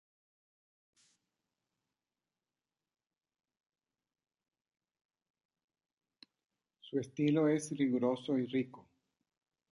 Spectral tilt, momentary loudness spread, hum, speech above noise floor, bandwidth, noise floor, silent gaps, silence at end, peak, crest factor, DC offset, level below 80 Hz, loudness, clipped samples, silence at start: -6.5 dB/octave; 9 LU; none; over 57 dB; 11 kHz; under -90 dBFS; none; 0.9 s; -20 dBFS; 20 dB; under 0.1%; -86 dBFS; -34 LUFS; under 0.1%; 6.85 s